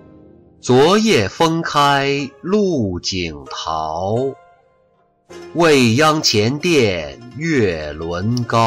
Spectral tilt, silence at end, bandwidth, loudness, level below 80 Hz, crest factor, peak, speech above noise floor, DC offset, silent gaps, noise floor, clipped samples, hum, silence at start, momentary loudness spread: -4.5 dB/octave; 0 s; 16 kHz; -16 LUFS; -46 dBFS; 12 dB; -4 dBFS; 42 dB; under 0.1%; none; -58 dBFS; under 0.1%; none; 0.65 s; 13 LU